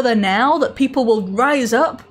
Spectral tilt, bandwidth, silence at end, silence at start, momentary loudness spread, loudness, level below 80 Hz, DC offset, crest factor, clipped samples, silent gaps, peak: -5 dB/octave; 16 kHz; 0.1 s; 0 s; 3 LU; -16 LUFS; -54 dBFS; under 0.1%; 12 dB; under 0.1%; none; -4 dBFS